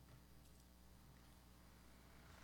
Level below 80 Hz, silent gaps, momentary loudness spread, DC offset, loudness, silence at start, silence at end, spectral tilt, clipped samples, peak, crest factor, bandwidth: -70 dBFS; none; 2 LU; under 0.1%; -66 LUFS; 0 s; 0 s; -4.5 dB/octave; under 0.1%; -50 dBFS; 14 dB; 17.5 kHz